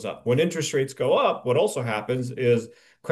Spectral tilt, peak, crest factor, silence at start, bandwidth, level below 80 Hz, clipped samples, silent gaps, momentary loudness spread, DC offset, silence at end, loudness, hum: -5 dB/octave; -8 dBFS; 16 dB; 0 s; 12.5 kHz; -68 dBFS; under 0.1%; none; 6 LU; under 0.1%; 0 s; -24 LUFS; none